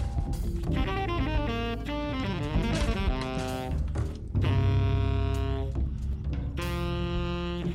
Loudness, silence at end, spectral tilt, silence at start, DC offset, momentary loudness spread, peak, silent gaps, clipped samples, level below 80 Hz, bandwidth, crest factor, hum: -30 LUFS; 0 s; -7 dB/octave; 0 s; under 0.1%; 6 LU; -16 dBFS; none; under 0.1%; -32 dBFS; 15 kHz; 12 dB; none